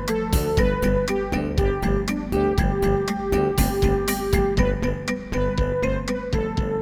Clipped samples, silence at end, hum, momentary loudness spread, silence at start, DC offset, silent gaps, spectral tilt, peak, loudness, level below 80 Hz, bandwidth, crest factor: under 0.1%; 0 s; none; 4 LU; 0 s; under 0.1%; none; -6 dB/octave; -6 dBFS; -23 LUFS; -28 dBFS; 19.5 kHz; 16 dB